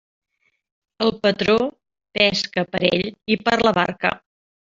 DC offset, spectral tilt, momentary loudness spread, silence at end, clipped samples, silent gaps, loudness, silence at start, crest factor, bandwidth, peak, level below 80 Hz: under 0.1%; -5 dB/octave; 6 LU; 0.55 s; under 0.1%; none; -20 LUFS; 1 s; 20 dB; 7.6 kHz; -2 dBFS; -54 dBFS